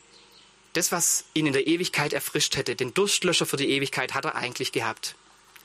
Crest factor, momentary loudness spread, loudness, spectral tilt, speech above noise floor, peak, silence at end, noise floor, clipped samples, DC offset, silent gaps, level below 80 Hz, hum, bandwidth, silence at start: 20 dB; 7 LU; -25 LUFS; -2.5 dB/octave; 29 dB; -8 dBFS; 0.5 s; -55 dBFS; under 0.1%; under 0.1%; none; -64 dBFS; 50 Hz at -55 dBFS; 15.5 kHz; 0.75 s